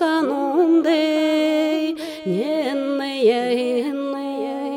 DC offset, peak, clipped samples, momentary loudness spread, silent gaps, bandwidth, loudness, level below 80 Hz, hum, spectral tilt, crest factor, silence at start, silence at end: under 0.1%; -6 dBFS; under 0.1%; 9 LU; none; 15.5 kHz; -20 LUFS; -70 dBFS; none; -5.5 dB/octave; 12 dB; 0 s; 0 s